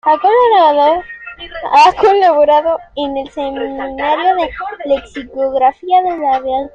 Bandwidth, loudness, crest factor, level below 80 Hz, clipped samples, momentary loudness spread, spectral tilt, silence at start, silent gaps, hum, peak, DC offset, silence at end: 8.6 kHz; -13 LUFS; 12 dB; -44 dBFS; under 0.1%; 13 LU; -4 dB/octave; 0.05 s; none; none; 0 dBFS; under 0.1%; 0.05 s